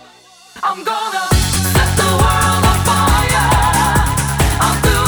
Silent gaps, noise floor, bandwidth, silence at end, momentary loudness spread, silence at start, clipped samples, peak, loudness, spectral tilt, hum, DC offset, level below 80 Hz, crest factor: none; -43 dBFS; over 20 kHz; 0 s; 6 LU; 0.55 s; under 0.1%; -2 dBFS; -14 LUFS; -4 dB/octave; none; under 0.1%; -22 dBFS; 12 dB